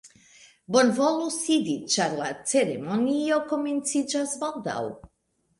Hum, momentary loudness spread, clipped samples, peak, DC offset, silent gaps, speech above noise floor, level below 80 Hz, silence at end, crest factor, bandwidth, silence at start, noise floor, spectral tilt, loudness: none; 8 LU; under 0.1%; -8 dBFS; under 0.1%; none; 47 dB; -66 dBFS; 0.55 s; 18 dB; 11.5 kHz; 0.05 s; -72 dBFS; -3.5 dB/octave; -25 LUFS